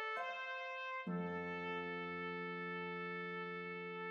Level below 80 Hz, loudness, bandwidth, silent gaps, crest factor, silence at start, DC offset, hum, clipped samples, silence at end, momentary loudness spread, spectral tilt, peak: -84 dBFS; -44 LUFS; 7 kHz; none; 12 dB; 0 s; under 0.1%; none; under 0.1%; 0 s; 2 LU; -3.5 dB/octave; -32 dBFS